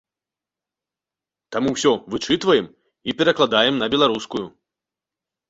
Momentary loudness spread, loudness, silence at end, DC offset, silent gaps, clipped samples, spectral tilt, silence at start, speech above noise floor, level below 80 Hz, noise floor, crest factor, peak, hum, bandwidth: 13 LU; -20 LUFS; 1 s; under 0.1%; none; under 0.1%; -4 dB/octave; 1.5 s; 69 dB; -58 dBFS; -89 dBFS; 20 dB; -2 dBFS; none; 8 kHz